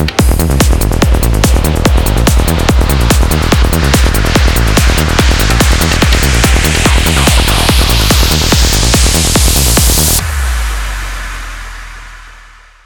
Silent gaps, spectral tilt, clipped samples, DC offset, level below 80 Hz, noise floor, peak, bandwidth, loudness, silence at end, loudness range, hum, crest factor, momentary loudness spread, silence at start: none; -4 dB/octave; under 0.1%; 0.7%; -12 dBFS; -37 dBFS; 0 dBFS; over 20 kHz; -9 LUFS; 0.55 s; 2 LU; none; 10 dB; 10 LU; 0 s